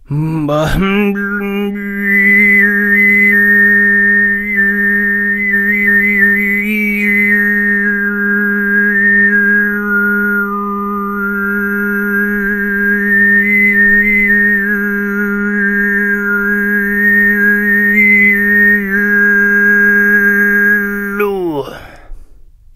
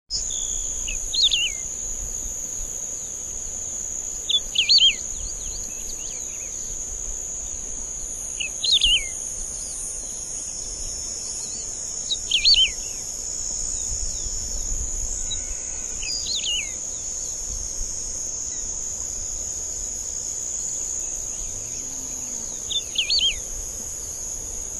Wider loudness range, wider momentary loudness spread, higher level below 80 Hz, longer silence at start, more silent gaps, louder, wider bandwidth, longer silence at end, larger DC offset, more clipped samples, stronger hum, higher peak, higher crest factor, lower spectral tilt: about the same, 4 LU vs 6 LU; about the same, 9 LU vs 11 LU; about the same, -36 dBFS vs -38 dBFS; about the same, 0.1 s vs 0.1 s; neither; first, -10 LUFS vs -23 LUFS; first, 15 kHz vs 13.5 kHz; first, 0.55 s vs 0 s; neither; neither; neither; first, 0 dBFS vs -8 dBFS; second, 12 dB vs 20 dB; first, -7 dB/octave vs 1 dB/octave